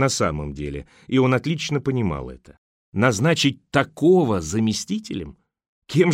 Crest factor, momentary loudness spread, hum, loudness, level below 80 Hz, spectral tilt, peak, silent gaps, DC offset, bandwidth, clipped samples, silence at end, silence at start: 18 dB; 14 LU; none; -22 LUFS; -44 dBFS; -5.5 dB/octave; -4 dBFS; 2.58-2.92 s, 5.68-5.82 s; under 0.1%; 15.5 kHz; under 0.1%; 0 s; 0 s